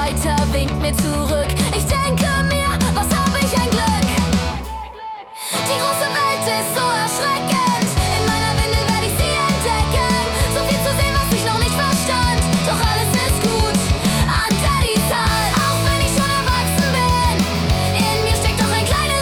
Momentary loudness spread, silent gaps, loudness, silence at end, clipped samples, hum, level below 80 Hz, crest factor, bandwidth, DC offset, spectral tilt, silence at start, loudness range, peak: 3 LU; none; -17 LUFS; 0 s; under 0.1%; none; -26 dBFS; 12 dB; 19 kHz; under 0.1%; -4 dB/octave; 0 s; 2 LU; -6 dBFS